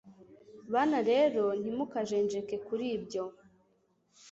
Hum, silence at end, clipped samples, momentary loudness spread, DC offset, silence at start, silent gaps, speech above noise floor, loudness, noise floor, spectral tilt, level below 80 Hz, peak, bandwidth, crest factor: none; 0 s; under 0.1%; 10 LU; under 0.1%; 0.05 s; none; 41 dB; -31 LUFS; -72 dBFS; -5.5 dB/octave; -74 dBFS; -16 dBFS; 8 kHz; 16 dB